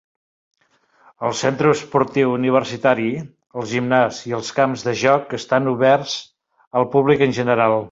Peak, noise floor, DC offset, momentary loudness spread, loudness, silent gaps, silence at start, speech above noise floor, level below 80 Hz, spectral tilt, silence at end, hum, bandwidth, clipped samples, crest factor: 0 dBFS; -60 dBFS; under 0.1%; 9 LU; -19 LUFS; 6.67-6.71 s; 1.2 s; 42 dB; -58 dBFS; -5.5 dB/octave; 0.05 s; none; 8 kHz; under 0.1%; 18 dB